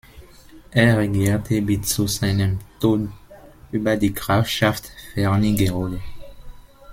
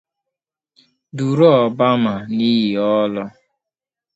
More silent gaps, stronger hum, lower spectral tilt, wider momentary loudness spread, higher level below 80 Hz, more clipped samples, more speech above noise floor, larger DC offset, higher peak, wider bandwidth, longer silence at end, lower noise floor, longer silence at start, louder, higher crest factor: neither; neither; second, -5.5 dB/octave vs -7.5 dB/octave; about the same, 12 LU vs 14 LU; first, -40 dBFS vs -62 dBFS; neither; second, 25 dB vs 71 dB; neither; about the same, -2 dBFS vs 0 dBFS; first, 16.5 kHz vs 8 kHz; second, 0 s vs 0.85 s; second, -45 dBFS vs -86 dBFS; second, 0.15 s vs 1.15 s; second, -21 LUFS vs -16 LUFS; about the same, 20 dB vs 18 dB